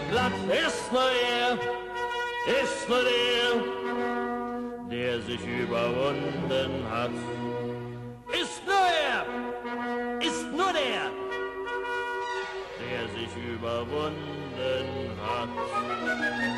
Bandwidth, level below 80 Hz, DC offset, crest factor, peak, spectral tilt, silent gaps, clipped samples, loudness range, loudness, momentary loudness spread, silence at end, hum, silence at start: 13 kHz; -58 dBFS; under 0.1%; 16 dB; -14 dBFS; -4 dB/octave; none; under 0.1%; 6 LU; -29 LUFS; 10 LU; 0 s; none; 0 s